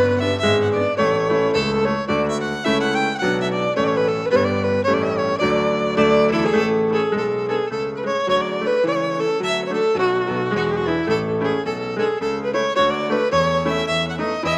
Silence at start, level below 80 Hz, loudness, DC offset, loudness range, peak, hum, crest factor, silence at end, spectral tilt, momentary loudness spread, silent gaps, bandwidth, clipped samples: 0 s; -48 dBFS; -20 LUFS; under 0.1%; 2 LU; -4 dBFS; none; 16 dB; 0 s; -5.5 dB/octave; 4 LU; none; 11 kHz; under 0.1%